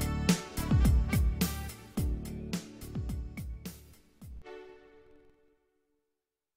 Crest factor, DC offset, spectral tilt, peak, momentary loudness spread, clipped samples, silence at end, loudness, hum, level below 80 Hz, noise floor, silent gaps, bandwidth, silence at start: 20 dB; under 0.1%; -5.5 dB/octave; -12 dBFS; 22 LU; under 0.1%; 1.8 s; -33 LUFS; none; -36 dBFS; -87 dBFS; none; 16 kHz; 0 s